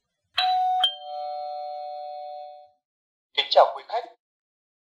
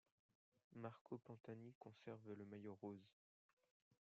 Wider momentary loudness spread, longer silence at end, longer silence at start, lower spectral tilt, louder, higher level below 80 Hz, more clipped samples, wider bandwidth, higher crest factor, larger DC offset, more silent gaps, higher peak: first, 18 LU vs 6 LU; first, 0.7 s vs 0.15 s; second, 0.35 s vs 0.7 s; second, 0 dB/octave vs -7.5 dB/octave; first, -25 LUFS vs -58 LUFS; first, -80 dBFS vs under -90 dBFS; neither; first, 15.5 kHz vs 7 kHz; about the same, 22 dB vs 20 dB; neither; second, 2.85-3.30 s vs 1.01-1.05 s, 1.40-1.44 s, 1.75-1.81 s, 3.13-3.57 s, 3.71-3.91 s; first, -4 dBFS vs -38 dBFS